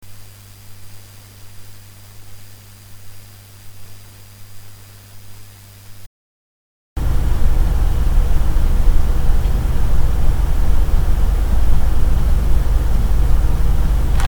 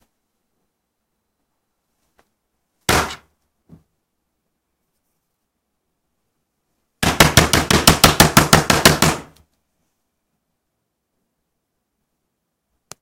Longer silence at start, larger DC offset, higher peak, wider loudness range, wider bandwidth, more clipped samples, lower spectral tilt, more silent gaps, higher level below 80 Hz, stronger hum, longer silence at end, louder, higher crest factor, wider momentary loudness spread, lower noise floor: second, 0.05 s vs 2.9 s; neither; about the same, 0 dBFS vs 0 dBFS; first, 21 LU vs 13 LU; first, 19 kHz vs 16.5 kHz; neither; first, -6.5 dB/octave vs -3 dB/octave; first, 6.06-6.96 s vs none; first, -16 dBFS vs -36 dBFS; first, 50 Hz at -25 dBFS vs none; second, 0 s vs 3.8 s; second, -20 LUFS vs -13 LUFS; second, 14 dB vs 20 dB; first, 21 LU vs 11 LU; second, -38 dBFS vs -75 dBFS